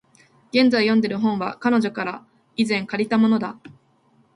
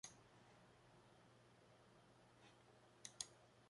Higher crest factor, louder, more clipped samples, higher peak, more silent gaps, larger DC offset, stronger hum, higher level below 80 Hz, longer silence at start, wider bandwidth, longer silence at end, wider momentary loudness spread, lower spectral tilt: second, 18 dB vs 36 dB; first, -21 LUFS vs -60 LUFS; neither; first, -4 dBFS vs -28 dBFS; neither; neither; neither; first, -66 dBFS vs -86 dBFS; first, 0.55 s vs 0.05 s; about the same, 11 kHz vs 11 kHz; first, 0.65 s vs 0 s; second, 12 LU vs 16 LU; first, -6 dB/octave vs -1.5 dB/octave